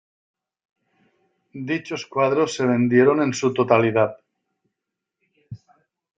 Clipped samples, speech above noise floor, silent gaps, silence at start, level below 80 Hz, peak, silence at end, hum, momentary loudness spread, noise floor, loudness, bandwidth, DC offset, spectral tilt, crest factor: under 0.1%; 64 dB; none; 1.55 s; -66 dBFS; -2 dBFS; 0.6 s; none; 11 LU; -83 dBFS; -20 LUFS; 9.2 kHz; under 0.1%; -6 dB/octave; 20 dB